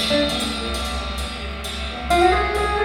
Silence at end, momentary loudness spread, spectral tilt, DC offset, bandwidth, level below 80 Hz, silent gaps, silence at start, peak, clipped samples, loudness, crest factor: 0 s; 11 LU; -4 dB/octave; under 0.1%; 16.5 kHz; -30 dBFS; none; 0 s; -4 dBFS; under 0.1%; -21 LUFS; 16 dB